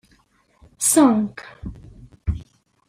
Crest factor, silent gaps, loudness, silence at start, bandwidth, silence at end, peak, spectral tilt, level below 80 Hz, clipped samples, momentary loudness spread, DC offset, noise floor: 20 dB; none; -19 LUFS; 0.8 s; 16 kHz; 0.45 s; -2 dBFS; -4.5 dB/octave; -40 dBFS; under 0.1%; 22 LU; under 0.1%; -60 dBFS